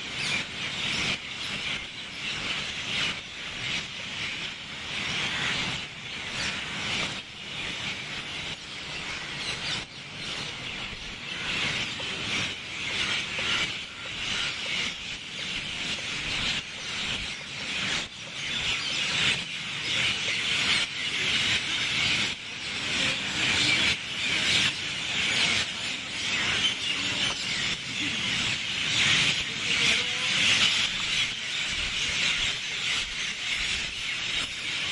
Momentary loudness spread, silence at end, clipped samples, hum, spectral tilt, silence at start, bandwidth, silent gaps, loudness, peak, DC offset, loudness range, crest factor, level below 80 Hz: 11 LU; 0 s; under 0.1%; none; -1 dB/octave; 0 s; 11.5 kHz; none; -27 LUFS; -8 dBFS; under 0.1%; 7 LU; 20 dB; -54 dBFS